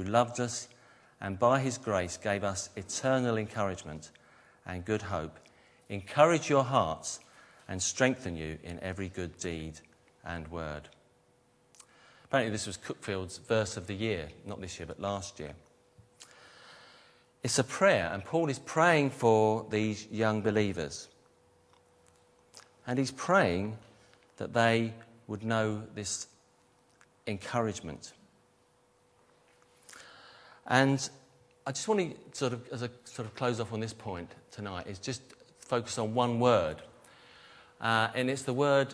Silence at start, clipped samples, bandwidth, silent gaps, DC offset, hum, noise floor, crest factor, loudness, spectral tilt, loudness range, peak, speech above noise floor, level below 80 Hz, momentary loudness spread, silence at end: 0 s; under 0.1%; 11 kHz; none; under 0.1%; none; -67 dBFS; 26 dB; -31 LUFS; -4.5 dB/octave; 11 LU; -8 dBFS; 36 dB; -62 dBFS; 19 LU; 0 s